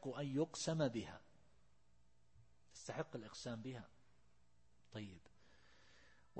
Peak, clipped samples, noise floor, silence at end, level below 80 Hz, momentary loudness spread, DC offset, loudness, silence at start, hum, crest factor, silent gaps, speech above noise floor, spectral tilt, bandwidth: -28 dBFS; under 0.1%; -77 dBFS; 0 s; -76 dBFS; 20 LU; under 0.1%; -46 LUFS; 0 s; none; 22 dB; none; 32 dB; -5 dB/octave; 8.4 kHz